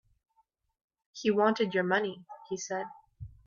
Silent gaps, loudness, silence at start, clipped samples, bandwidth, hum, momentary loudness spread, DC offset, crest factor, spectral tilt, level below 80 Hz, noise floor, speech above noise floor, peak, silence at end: none; -30 LUFS; 1.15 s; under 0.1%; 7.4 kHz; none; 22 LU; under 0.1%; 20 dB; -4.5 dB/octave; -64 dBFS; -73 dBFS; 44 dB; -14 dBFS; 0.2 s